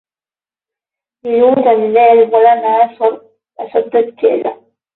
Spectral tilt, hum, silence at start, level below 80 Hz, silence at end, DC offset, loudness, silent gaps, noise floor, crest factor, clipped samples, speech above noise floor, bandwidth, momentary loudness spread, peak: -8.5 dB/octave; 50 Hz at -55 dBFS; 1.25 s; -62 dBFS; 0.4 s; under 0.1%; -11 LUFS; none; under -90 dBFS; 12 dB; under 0.1%; over 79 dB; 4.1 kHz; 13 LU; 0 dBFS